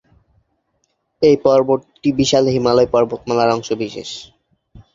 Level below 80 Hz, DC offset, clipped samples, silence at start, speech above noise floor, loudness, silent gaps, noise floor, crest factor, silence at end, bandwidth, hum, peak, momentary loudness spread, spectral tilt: -48 dBFS; under 0.1%; under 0.1%; 1.2 s; 52 dB; -16 LUFS; none; -68 dBFS; 18 dB; 0.7 s; 7.8 kHz; none; 0 dBFS; 11 LU; -5.5 dB/octave